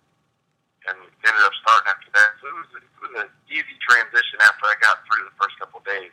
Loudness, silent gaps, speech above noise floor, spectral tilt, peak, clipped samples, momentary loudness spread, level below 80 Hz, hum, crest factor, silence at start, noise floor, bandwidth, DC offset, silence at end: -18 LUFS; none; 52 dB; 1 dB/octave; -2 dBFS; under 0.1%; 18 LU; -82 dBFS; none; 18 dB; 0.85 s; -71 dBFS; 15.5 kHz; under 0.1%; 0.05 s